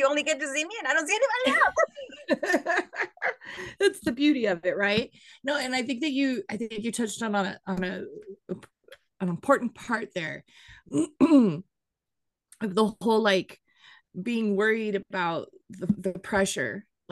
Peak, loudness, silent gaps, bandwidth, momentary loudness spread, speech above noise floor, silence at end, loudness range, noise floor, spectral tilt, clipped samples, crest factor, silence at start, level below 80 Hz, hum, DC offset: -8 dBFS; -27 LUFS; none; 12.5 kHz; 15 LU; 59 dB; 0.3 s; 5 LU; -86 dBFS; -4.5 dB/octave; under 0.1%; 20 dB; 0 s; -64 dBFS; none; under 0.1%